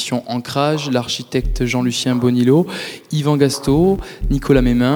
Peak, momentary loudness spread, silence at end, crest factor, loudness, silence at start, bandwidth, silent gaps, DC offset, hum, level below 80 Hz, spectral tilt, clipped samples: -2 dBFS; 8 LU; 0 s; 16 dB; -17 LUFS; 0 s; over 20 kHz; none; under 0.1%; none; -28 dBFS; -6 dB/octave; under 0.1%